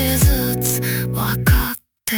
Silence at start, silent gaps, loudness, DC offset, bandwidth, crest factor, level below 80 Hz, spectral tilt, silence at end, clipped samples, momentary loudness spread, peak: 0 s; none; -18 LUFS; under 0.1%; 19 kHz; 16 dB; -24 dBFS; -4.5 dB/octave; 0 s; under 0.1%; 6 LU; -2 dBFS